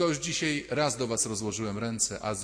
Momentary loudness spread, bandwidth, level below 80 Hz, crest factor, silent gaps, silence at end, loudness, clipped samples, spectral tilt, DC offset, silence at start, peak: 4 LU; 16 kHz; -58 dBFS; 16 dB; none; 0 s; -29 LUFS; under 0.1%; -3 dB/octave; under 0.1%; 0 s; -14 dBFS